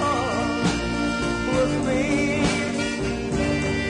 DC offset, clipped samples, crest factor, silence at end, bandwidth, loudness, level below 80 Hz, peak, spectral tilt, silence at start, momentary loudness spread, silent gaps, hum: under 0.1%; under 0.1%; 14 dB; 0 s; 11 kHz; -23 LUFS; -38 dBFS; -10 dBFS; -5 dB/octave; 0 s; 3 LU; none; none